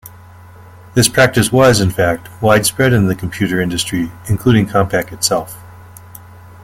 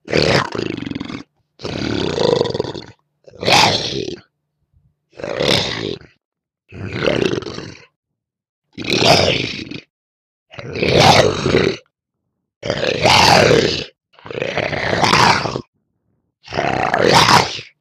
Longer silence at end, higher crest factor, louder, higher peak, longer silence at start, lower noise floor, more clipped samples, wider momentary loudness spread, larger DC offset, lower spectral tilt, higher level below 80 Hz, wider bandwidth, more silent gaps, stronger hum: first, 0.8 s vs 0.15 s; about the same, 14 dB vs 18 dB; about the same, -14 LUFS vs -15 LUFS; about the same, 0 dBFS vs 0 dBFS; about the same, 0.05 s vs 0.05 s; second, -38 dBFS vs -75 dBFS; neither; second, 9 LU vs 21 LU; neither; about the same, -4.5 dB/octave vs -4 dB/octave; about the same, -40 dBFS vs -42 dBFS; about the same, 16.5 kHz vs 15 kHz; second, none vs 6.25-6.32 s, 7.96-8.03 s, 8.49-8.62 s, 9.90-10.46 s, 12.56-12.61 s, 15.68-15.73 s; neither